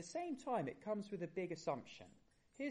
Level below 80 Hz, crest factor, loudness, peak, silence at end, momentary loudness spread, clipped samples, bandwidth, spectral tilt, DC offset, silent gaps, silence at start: -80 dBFS; 18 dB; -45 LUFS; -26 dBFS; 0 s; 14 LU; under 0.1%; 11 kHz; -5.5 dB/octave; under 0.1%; none; 0 s